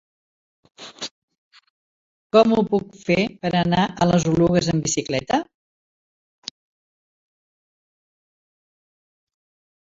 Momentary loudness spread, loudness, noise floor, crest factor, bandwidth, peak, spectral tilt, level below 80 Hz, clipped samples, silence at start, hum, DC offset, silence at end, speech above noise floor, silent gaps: 20 LU; -20 LUFS; under -90 dBFS; 22 dB; 7.8 kHz; -2 dBFS; -5.5 dB/octave; -52 dBFS; under 0.1%; 0.8 s; none; under 0.1%; 4.45 s; over 71 dB; 1.11-1.28 s, 1.38-1.51 s, 1.70-2.30 s